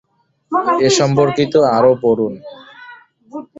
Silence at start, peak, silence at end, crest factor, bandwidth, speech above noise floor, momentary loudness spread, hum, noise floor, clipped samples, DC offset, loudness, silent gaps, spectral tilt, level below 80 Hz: 0.5 s; -2 dBFS; 0.15 s; 14 dB; 8 kHz; 27 dB; 21 LU; none; -41 dBFS; under 0.1%; under 0.1%; -14 LUFS; none; -5 dB/octave; -54 dBFS